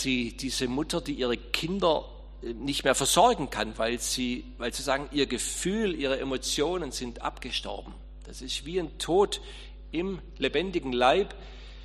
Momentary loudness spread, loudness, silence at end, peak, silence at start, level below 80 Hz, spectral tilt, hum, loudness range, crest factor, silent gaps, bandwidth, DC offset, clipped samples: 16 LU; -28 LUFS; 0 s; -6 dBFS; 0 s; -44 dBFS; -3 dB/octave; none; 5 LU; 22 dB; none; 13 kHz; under 0.1%; under 0.1%